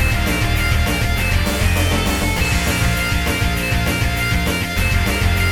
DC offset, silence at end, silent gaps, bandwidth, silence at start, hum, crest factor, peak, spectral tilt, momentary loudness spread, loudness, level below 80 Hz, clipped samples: 0.3%; 0 s; none; 19 kHz; 0 s; none; 14 dB; -4 dBFS; -4.5 dB/octave; 1 LU; -18 LUFS; -22 dBFS; under 0.1%